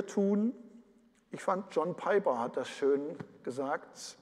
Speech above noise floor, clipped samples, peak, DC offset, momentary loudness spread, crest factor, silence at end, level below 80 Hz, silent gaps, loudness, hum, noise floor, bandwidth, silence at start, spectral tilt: 32 dB; under 0.1%; -16 dBFS; under 0.1%; 13 LU; 18 dB; 0.05 s; -82 dBFS; none; -33 LUFS; none; -65 dBFS; 12 kHz; 0 s; -6 dB/octave